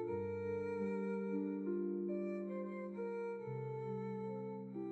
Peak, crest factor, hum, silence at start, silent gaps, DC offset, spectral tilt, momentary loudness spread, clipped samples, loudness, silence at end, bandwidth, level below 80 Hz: -30 dBFS; 12 dB; none; 0 s; none; under 0.1%; -10 dB/octave; 5 LU; under 0.1%; -42 LUFS; 0 s; 8 kHz; -82 dBFS